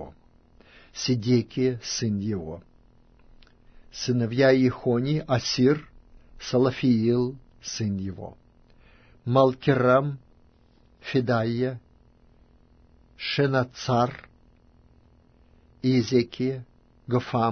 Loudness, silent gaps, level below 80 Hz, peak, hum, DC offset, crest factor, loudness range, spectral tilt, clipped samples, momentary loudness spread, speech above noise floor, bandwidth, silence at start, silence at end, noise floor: -25 LUFS; none; -56 dBFS; -6 dBFS; none; under 0.1%; 20 dB; 5 LU; -6 dB/octave; under 0.1%; 18 LU; 35 dB; 6.6 kHz; 0 s; 0 s; -58 dBFS